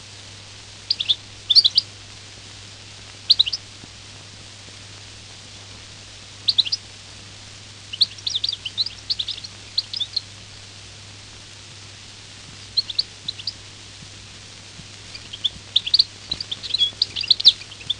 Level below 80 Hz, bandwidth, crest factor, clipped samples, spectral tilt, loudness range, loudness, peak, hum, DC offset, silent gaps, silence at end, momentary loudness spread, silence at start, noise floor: -54 dBFS; 11 kHz; 24 dB; under 0.1%; -0.5 dB/octave; 10 LU; -19 LUFS; 0 dBFS; none; under 0.1%; none; 0 s; 23 LU; 0 s; -41 dBFS